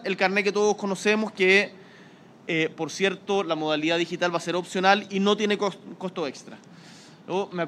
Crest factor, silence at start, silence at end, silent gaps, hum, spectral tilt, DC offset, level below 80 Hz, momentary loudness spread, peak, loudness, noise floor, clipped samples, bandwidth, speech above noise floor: 22 dB; 0 s; 0 s; none; none; -4 dB/octave; under 0.1%; -74 dBFS; 11 LU; -4 dBFS; -24 LUFS; -50 dBFS; under 0.1%; 12 kHz; 25 dB